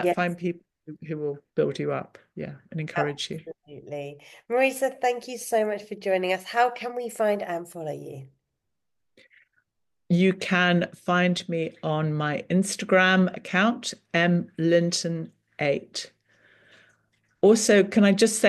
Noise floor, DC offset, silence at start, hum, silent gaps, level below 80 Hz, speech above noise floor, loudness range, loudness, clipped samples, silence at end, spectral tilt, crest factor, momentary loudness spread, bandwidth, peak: -84 dBFS; under 0.1%; 0 s; none; none; -72 dBFS; 60 dB; 8 LU; -25 LUFS; under 0.1%; 0 s; -5 dB/octave; 18 dB; 18 LU; 12.5 kHz; -6 dBFS